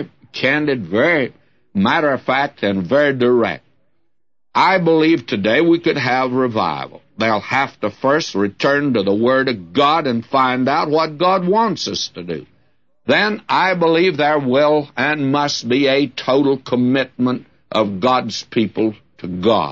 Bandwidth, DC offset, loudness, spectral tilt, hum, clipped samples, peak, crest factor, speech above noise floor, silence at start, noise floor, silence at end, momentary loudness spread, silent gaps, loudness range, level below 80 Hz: 7.4 kHz; 0.2%; -17 LUFS; -5.5 dB/octave; none; under 0.1%; -2 dBFS; 14 dB; 61 dB; 0 s; -77 dBFS; 0 s; 7 LU; none; 2 LU; -60 dBFS